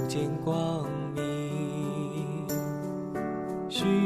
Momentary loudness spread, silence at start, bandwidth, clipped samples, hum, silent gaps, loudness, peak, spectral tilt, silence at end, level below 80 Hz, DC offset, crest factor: 5 LU; 0 s; 13.5 kHz; under 0.1%; none; none; -32 LUFS; -16 dBFS; -6 dB/octave; 0 s; -60 dBFS; under 0.1%; 16 dB